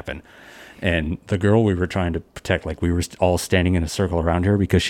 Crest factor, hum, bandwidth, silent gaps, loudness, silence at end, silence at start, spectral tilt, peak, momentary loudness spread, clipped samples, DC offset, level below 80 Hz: 18 dB; none; 16 kHz; none; -21 LUFS; 0 s; 0.05 s; -6 dB/octave; -2 dBFS; 8 LU; under 0.1%; under 0.1%; -36 dBFS